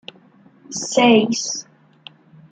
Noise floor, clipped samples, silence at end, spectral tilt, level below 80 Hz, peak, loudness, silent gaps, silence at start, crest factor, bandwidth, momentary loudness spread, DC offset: -51 dBFS; under 0.1%; 0.9 s; -3 dB/octave; -66 dBFS; -2 dBFS; -17 LUFS; none; 0.7 s; 20 dB; 9.4 kHz; 15 LU; under 0.1%